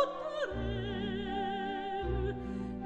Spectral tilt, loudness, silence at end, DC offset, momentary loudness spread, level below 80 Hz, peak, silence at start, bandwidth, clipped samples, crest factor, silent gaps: -7 dB/octave; -36 LUFS; 0 s; under 0.1%; 2 LU; -44 dBFS; -16 dBFS; 0 s; 8.4 kHz; under 0.1%; 18 dB; none